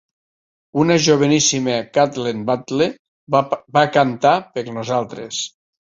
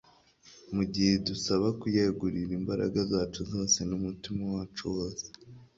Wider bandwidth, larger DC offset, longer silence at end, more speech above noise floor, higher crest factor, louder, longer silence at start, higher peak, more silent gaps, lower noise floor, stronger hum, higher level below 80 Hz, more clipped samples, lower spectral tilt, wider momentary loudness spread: about the same, 7.8 kHz vs 7.8 kHz; neither; first, 0.35 s vs 0.1 s; first, over 73 dB vs 29 dB; about the same, 18 dB vs 18 dB; first, -18 LUFS vs -30 LUFS; first, 0.75 s vs 0.45 s; first, -2 dBFS vs -14 dBFS; first, 2.99-3.27 s vs none; first, under -90 dBFS vs -59 dBFS; neither; about the same, -58 dBFS vs -54 dBFS; neither; about the same, -4 dB/octave vs -4.5 dB/octave; first, 12 LU vs 9 LU